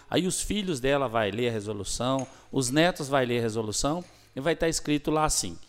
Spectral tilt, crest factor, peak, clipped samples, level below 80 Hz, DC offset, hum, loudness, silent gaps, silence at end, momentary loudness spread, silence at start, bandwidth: -4 dB/octave; 20 dB; -8 dBFS; under 0.1%; -44 dBFS; under 0.1%; none; -27 LUFS; none; 0.05 s; 7 LU; 0.1 s; 16 kHz